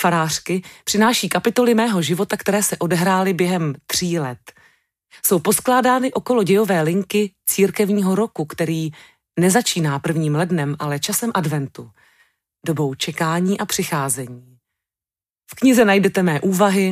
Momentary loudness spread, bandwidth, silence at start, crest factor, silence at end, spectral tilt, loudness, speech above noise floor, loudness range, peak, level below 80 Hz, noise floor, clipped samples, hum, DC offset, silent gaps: 8 LU; 16 kHz; 0 s; 16 dB; 0 s; -4.5 dB/octave; -18 LUFS; over 72 dB; 5 LU; -4 dBFS; -60 dBFS; under -90 dBFS; under 0.1%; none; under 0.1%; none